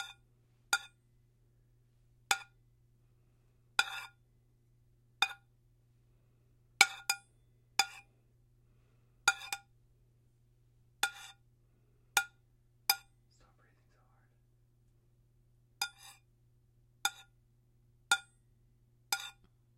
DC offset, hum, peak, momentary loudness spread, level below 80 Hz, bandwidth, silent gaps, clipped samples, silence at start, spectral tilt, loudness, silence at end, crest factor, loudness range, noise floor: under 0.1%; none; -4 dBFS; 16 LU; -74 dBFS; 16.5 kHz; none; under 0.1%; 0 s; 1.5 dB/octave; -35 LUFS; 0.45 s; 38 dB; 10 LU; -69 dBFS